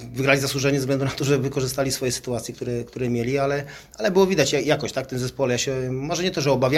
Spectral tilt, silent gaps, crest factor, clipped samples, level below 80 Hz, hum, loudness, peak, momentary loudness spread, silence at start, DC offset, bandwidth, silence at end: -4.5 dB/octave; none; 20 dB; under 0.1%; -50 dBFS; none; -23 LUFS; -2 dBFS; 9 LU; 0 s; under 0.1%; 16 kHz; 0 s